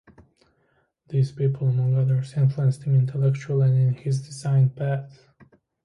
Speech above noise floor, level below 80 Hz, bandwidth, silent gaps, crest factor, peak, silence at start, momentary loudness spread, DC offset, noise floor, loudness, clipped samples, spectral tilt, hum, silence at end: 46 dB; -62 dBFS; 10.5 kHz; none; 12 dB; -10 dBFS; 1.1 s; 7 LU; under 0.1%; -67 dBFS; -23 LUFS; under 0.1%; -8.5 dB/octave; none; 0.75 s